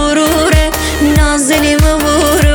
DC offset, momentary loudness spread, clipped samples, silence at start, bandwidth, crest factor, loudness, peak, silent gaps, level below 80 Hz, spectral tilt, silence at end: under 0.1%; 2 LU; under 0.1%; 0 s; over 20 kHz; 10 dB; -10 LUFS; 0 dBFS; none; -16 dBFS; -4.5 dB/octave; 0 s